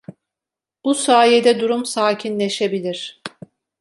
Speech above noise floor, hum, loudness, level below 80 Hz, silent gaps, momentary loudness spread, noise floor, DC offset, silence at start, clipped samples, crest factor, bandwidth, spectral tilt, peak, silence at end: 71 dB; none; -17 LUFS; -70 dBFS; none; 16 LU; -88 dBFS; under 0.1%; 0.1 s; under 0.1%; 18 dB; 11.5 kHz; -3.5 dB/octave; -2 dBFS; 0.55 s